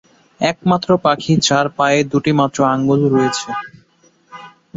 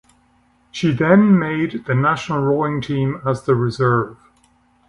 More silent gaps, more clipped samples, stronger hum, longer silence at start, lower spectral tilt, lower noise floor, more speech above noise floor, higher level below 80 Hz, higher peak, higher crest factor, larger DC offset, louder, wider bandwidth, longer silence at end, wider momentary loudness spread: neither; neither; neither; second, 0.4 s vs 0.75 s; second, -5 dB/octave vs -7.5 dB/octave; second, -54 dBFS vs -58 dBFS; about the same, 39 dB vs 41 dB; about the same, -52 dBFS vs -52 dBFS; about the same, -2 dBFS vs 0 dBFS; about the same, 16 dB vs 18 dB; neither; first, -15 LUFS vs -18 LUFS; second, 8 kHz vs 10.5 kHz; second, 0.3 s vs 0.75 s; about the same, 7 LU vs 9 LU